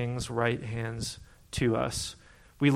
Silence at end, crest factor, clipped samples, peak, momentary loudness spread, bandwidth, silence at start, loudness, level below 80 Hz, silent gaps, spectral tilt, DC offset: 0 s; 20 dB; under 0.1%; -12 dBFS; 11 LU; 15.5 kHz; 0 s; -31 LUFS; -50 dBFS; none; -5 dB/octave; under 0.1%